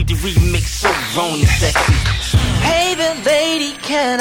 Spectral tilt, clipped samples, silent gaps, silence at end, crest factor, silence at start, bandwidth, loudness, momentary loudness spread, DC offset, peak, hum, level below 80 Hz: -4 dB/octave; under 0.1%; none; 0 s; 14 dB; 0 s; 17.5 kHz; -15 LUFS; 4 LU; under 0.1%; -2 dBFS; none; -24 dBFS